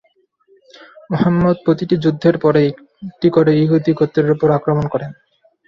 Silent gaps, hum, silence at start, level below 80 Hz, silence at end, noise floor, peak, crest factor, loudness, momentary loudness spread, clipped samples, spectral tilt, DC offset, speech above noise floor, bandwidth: none; none; 1.1 s; -50 dBFS; 0.55 s; -58 dBFS; -2 dBFS; 14 dB; -15 LUFS; 11 LU; under 0.1%; -9.5 dB/octave; under 0.1%; 43 dB; 6.8 kHz